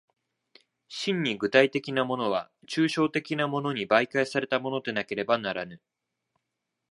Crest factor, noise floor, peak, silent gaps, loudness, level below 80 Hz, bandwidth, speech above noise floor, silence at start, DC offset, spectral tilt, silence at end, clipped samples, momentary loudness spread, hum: 26 dB; -83 dBFS; -4 dBFS; none; -27 LUFS; -72 dBFS; 11.5 kHz; 56 dB; 0.9 s; under 0.1%; -5 dB/octave; 1.15 s; under 0.1%; 10 LU; none